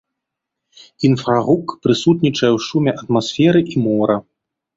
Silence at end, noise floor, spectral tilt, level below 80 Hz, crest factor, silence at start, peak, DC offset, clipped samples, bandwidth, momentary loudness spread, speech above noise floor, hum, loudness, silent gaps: 0.55 s; -80 dBFS; -6.5 dB/octave; -54 dBFS; 16 dB; 1 s; -2 dBFS; under 0.1%; under 0.1%; 7.8 kHz; 5 LU; 65 dB; none; -16 LUFS; none